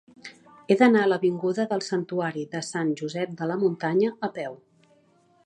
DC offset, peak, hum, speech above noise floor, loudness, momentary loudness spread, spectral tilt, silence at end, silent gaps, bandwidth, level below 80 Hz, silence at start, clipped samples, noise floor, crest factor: under 0.1%; -6 dBFS; none; 37 dB; -25 LUFS; 15 LU; -6 dB/octave; 0.9 s; none; 11 kHz; -76 dBFS; 0.25 s; under 0.1%; -62 dBFS; 20 dB